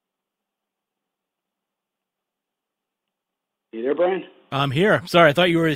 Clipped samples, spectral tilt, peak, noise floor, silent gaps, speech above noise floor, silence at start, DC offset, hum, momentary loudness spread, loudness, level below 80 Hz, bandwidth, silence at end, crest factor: under 0.1%; -6 dB/octave; 0 dBFS; -84 dBFS; none; 66 dB; 3.75 s; under 0.1%; none; 14 LU; -19 LUFS; -60 dBFS; 16 kHz; 0 s; 22 dB